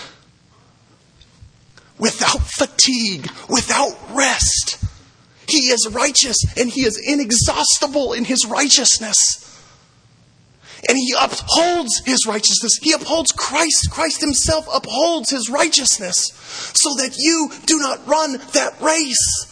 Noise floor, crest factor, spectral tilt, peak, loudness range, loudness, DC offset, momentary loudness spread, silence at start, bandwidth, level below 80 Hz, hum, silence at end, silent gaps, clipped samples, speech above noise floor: -52 dBFS; 18 dB; -1.5 dB/octave; 0 dBFS; 3 LU; -15 LUFS; under 0.1%; 6 LU; 0 s; 11 kHz; -38 dBFS; none; 0.05 s; none; under 0.1%; 35 dB